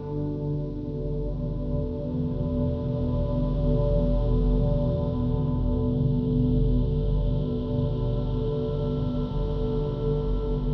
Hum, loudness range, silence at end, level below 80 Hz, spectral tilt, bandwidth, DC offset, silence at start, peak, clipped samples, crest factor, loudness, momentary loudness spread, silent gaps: none; 3 LU; 0 s; -30 dBFS; -11.5 dB/octave; 5 kHz; under 0.1%; 0 s; -12 dBFS; under 0.1%; 14 dB; -27 LUFS; 6 LU; none